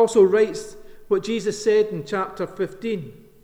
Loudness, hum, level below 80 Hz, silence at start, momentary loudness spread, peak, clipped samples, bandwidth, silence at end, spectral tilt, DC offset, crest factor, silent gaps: -22 LUFS; none; -54 dBFS; 0 s; 15 LU; -6 dBFS; under 0.1%; 12 kHz; 0.3 s; -5 dB/octave; under 0.1%; 16 dB; none